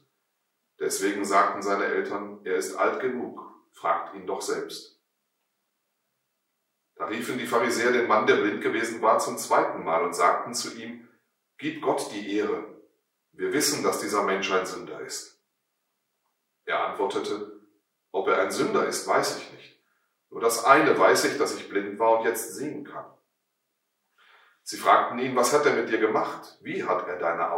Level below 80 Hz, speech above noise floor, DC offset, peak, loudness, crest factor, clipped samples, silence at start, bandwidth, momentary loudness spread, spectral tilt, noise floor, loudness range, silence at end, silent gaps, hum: -82 dBFS; 53 dB; under 0.1%; -2 dBFS; -25 LUFS; 24 dB; under 0.1%; 0.8 s; 16 kHz; 15 LU; -3 dB/octave; -79 dBFS; 9 LU; 0 s; none; none